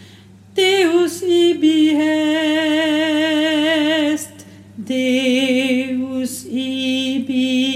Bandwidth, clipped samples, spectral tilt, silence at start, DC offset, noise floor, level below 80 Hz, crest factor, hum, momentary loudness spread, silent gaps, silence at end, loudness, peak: 15 kHz; under 0.1%; -3.5 dB/octave; 0 s; under 0.1%; -43 dBFS; -66 dBFS; 12 dB; none; 9 LU; none; 0 s; -17 LUFS; -4 dBFS